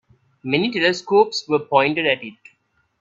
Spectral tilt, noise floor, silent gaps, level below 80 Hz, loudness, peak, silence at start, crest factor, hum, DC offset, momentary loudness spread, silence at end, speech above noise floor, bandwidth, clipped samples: -4.5 dB/octave; -65 dBFS; none; -64 dBFS; -19 LUFS; -2 dBFS; 0.45 s; 20 dB; none; under 0.1%; 8 LU; 0.7 s; 46 dB; 7.8 kHz; under 0.1%